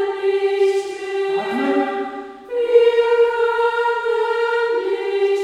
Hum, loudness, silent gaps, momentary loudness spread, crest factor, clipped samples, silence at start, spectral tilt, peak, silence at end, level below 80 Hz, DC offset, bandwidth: none; -18 LUFS; none; 9 LU; 16 dB; under 0.1%; 0 s; -3.5 dB/octave; -2 dBFS; 0 s; -62 dBFS; under 0.1%; 10.5 kHz